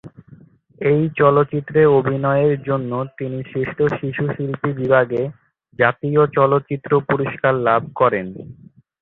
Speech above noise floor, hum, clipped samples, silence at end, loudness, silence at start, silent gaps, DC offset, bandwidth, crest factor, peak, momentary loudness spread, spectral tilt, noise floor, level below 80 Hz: 29 dB; none; under 0.1%; 0.5 s; -18 LUFS; 0.05 s; none; under 0.1%; 4.1 kHz; 18 dB; -2 dBFS; 10 LU; -10.5 dB/octave; -47 dBFS; -54 dBFS